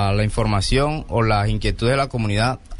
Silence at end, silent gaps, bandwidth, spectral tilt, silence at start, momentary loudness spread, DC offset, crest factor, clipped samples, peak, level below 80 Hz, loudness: 0 s; none; 11.5 kHz; -6 dB/octave; 0 s; 3 LU; under 0.1%; 14 dB; under 0.1%; -6 dBFS; -28 dBFS; -20 LUFS